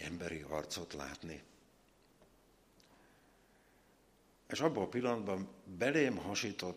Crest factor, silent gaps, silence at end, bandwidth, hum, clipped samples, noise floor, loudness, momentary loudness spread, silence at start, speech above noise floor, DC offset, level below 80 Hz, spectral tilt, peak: 24 dB; none; 0 s; 15 kHz; none; under 0.1%; -69 dBFS; -38 LUFS; 14 LU; 0 s; 31 dB; under 0.1%; -68 dBFS; -4.5 dB/octave; -18 dBFS